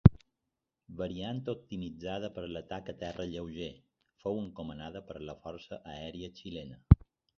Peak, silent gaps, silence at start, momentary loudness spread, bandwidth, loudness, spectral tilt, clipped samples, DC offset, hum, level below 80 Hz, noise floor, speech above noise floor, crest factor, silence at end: -2 dBFS; none; 0.05 s; 19 LU; 6.6 kHz; -36 LUFS; -8 dB/octave; under 0.1%; under 0.1%; none; -42 dBFS; -87 dBFS; 52 dB; 32 dB; 0.45 s